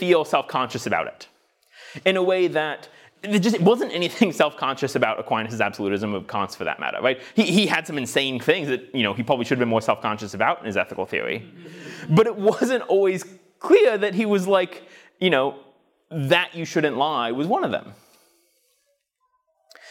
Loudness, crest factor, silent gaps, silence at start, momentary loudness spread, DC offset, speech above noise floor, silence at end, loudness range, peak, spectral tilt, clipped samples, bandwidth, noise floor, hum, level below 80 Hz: -22 LUFS; 18 dB; none; 0 s; 11 LU; under 0.1%; 49 dB; 0 s; 4 LU; -4 dBFS; -5 dB/octave; under 0.1%; 17 kHz; -71 dBFS; none; -68 dBFS